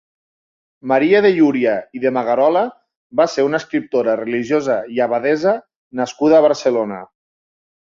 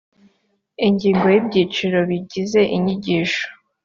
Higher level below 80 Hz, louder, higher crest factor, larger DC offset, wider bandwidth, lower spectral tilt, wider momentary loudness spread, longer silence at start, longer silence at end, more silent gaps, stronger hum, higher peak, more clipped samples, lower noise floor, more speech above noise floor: second, -62 dBFS vs -56 dBFS; about the same, -17 LUFS vs -18 LUFS; about the same, 16 dB vs 16 dB; neither; about the same, 7.6 kHz vs 7.4 kHz; about the same, -5.5 dB/octave vs -6 dB/octave; first, 12 LU vs 7 LU; about the same, 0.85 s vs 0.8 s; first, 0.9 s vs 0.3 s; first, 2.97-3.10 s, 5.76-5.91 s vs none; neither; about the same, -2 dBFS vs -4 dBFS; neither; first, under -90 dBFS vs -66 dBFS; first, over 74 dB vs 49 dB